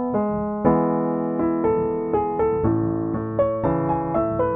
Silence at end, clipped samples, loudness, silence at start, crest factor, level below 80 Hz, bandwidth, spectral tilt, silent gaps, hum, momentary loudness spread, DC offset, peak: 0 s; under 0.1%; -22 LUFS; 0 s; 16 dB; -42 dBFS; 3.6 kHz; -12.5 dB/octave; none; none; 3 LU; under 0.1%; -6 dBFS